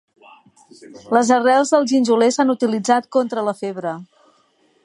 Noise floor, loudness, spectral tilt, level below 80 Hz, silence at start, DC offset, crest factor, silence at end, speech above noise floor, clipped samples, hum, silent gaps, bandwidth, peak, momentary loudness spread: -59 dBFS; -17 LUFS; -4 dB/octave; -74 dBFS; 0.8 s; under 0.1%; 18 dB; 0.8 s; 42 dB; under 0.1%; none; none; 11.5 kHz; -2 dBFS; 11 LU